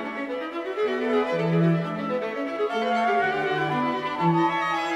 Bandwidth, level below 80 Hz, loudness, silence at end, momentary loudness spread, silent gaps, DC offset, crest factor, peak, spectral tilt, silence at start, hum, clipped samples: 9.4 kHz; -68 dBFS; -25 LUFS; 0 s; 8 LU; none; under 0.1%; 14 dB; -10 dBFS; -7 dB/octave; 0 s; none; under 0.1%